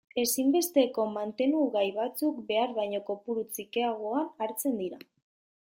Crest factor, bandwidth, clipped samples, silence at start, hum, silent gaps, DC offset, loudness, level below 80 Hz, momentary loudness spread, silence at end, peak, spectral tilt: 18 dB; 16.5 kHz; under 0.1%; 0.15 s; none; none; under 0.1%; -30 LUFS; -76 dBFS; 8 LU; 0.65 s; -12 dBFS; -3.5 dB/octave